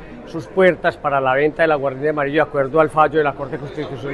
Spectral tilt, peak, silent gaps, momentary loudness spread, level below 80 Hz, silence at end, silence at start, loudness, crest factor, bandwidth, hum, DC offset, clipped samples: -7 dB/octave; -2 dBFS; none; 12 LU; -46 dBFS; 0 s; 0 s; -18 LUFS; 16 dB; 11.5 kHz; none; under 0.1%; under 0.1%